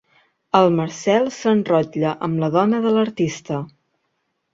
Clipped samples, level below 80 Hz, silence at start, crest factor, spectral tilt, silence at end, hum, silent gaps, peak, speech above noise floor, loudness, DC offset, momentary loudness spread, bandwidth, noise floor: under 0.1%; -60 dBFS; 0.55 s; 18 dB; -6.5 dB/octave; 0.85 s; none; none; -2 dBFS; 54 dB; -19 LUFS; under 0.1%; 9 LU; 7.8 kHz; -72 dBFS